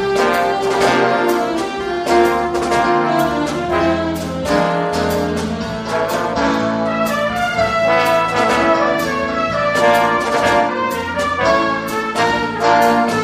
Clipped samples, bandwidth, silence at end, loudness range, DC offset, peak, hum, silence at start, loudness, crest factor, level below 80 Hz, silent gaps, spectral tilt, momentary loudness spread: under 0.1%; 15.5 kHz; 0 s; 3 LU; under 0.1%; -2 dBFS; none; 0 s; -16 LUFS; 14 dB; -40 dBFS; none; -4.5 dB/octave; 6 LU